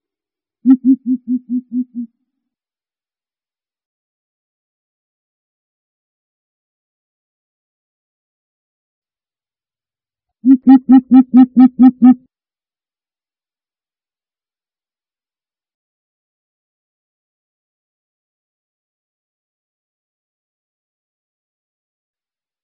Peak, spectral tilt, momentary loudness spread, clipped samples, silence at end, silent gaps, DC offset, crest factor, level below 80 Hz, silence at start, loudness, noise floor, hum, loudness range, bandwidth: 0 dBFS; -8 dB/octave; 14 LU; under 0.1%; 10.5 s; 3.85-9.02 s; under 0.1%; 18 dB; -64 dBFS; 0.65 s; -11 LUFS; under -90 dBFS; none; 16 LU; 3.1 kHz